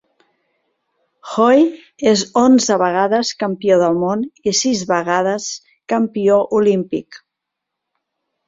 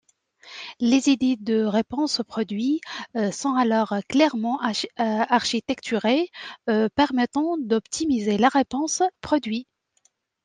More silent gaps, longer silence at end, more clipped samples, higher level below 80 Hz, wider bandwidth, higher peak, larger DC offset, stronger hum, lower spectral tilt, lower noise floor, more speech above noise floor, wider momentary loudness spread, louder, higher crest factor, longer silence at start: neither; first, 1.3 s vs 0.8 s; neither; about the same, -60 dBFS vs -62 dBFS; second, 7.8 kHz vs 9.8 kHz; first, 0 dBFS vs -6 dBFS; neither; neither; about the same, -4 dB/octave vs -4 dB/octave; first, -80 dBFS vs -67 dBFS; first, 65 dB vs 44 dB; first, 10 LU vs 7 LU; first, -16 LUFS vs -23 LUFS; about the same, 16 dB vs 18 dB; first, 1.25 s vs 0.45 s